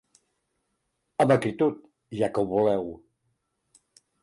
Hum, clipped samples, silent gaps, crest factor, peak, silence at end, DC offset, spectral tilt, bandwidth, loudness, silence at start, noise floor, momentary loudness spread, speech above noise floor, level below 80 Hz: none; under 0.1%; none; 18 dB; -10 dBFS; 1.25 s; under 0.1%; -7 dB/octave; 11.5 kHz; -25 LUFS; 1.2 s; -77 dBFS; 16 LU; 53 dB; -62 dBFS